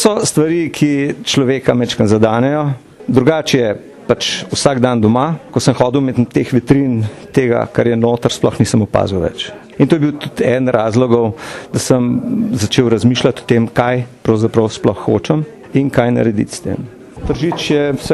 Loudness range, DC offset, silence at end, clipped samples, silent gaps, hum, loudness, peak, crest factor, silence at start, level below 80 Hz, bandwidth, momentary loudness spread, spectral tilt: 1 LU; under 0.1%; 0 s; under 0.1%; none; none; -14 LUFS; 0 dBFS; 14 dB; 0 s; -42 dBFS; 12.5 kHz; 7 LU; -5.5 dB/octave